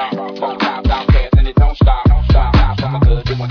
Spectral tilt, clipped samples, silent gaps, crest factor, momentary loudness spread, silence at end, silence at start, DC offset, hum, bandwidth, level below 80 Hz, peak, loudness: -8.5 dB/octave; under 0.1%; none; 12 dB; 6 LU; 0 s; 0 s; under 0.1%; none; 5.4 kHz; -14 dBFS; 0 dBFS; -14 LUFS